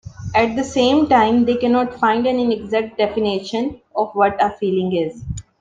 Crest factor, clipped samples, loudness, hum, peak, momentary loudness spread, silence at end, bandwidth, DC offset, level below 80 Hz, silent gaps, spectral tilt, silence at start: 16 dB; under 0.1%; -18 LUFS; none; -2 dBFS; 10 LU; 0.2 s; 9.4 kHz; under 0.1%; -46 dBFS; none; -5.5 dB/octave; 0.05 s